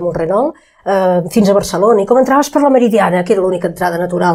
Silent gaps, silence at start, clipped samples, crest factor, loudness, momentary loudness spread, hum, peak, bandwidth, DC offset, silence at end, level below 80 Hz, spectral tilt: none; 0 s; under 0.1%; 12 dB; -12 LUFS; 6 LU; none; 0 dBFS; 16 kHz; under 0.1%; 0 s; -46 dBFS; -6 dB/octave